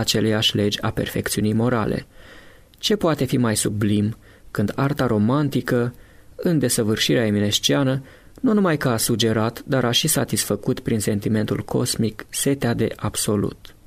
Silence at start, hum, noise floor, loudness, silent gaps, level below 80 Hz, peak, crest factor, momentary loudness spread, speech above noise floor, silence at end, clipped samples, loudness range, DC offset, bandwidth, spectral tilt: 0 s; none; -46 dBFS; -21 LUFS; none; -46 dBFS; -6 dBFS; 16 dB; 6 LU; 25 dB; 0.3 s; under 0.1%; 3 LU; under 0.1%; 16 kHz; -4.5 dB/octave